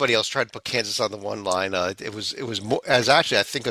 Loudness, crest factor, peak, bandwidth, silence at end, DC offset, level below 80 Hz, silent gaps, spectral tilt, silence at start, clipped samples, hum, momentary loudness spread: -23 LUFS; 20 dB; -4 dBFS; 16 kHz; 0 s; under 0.1%; -56 dBFS; none; -3 dB/octave; 0 s; under 0.1%; none; 11 LU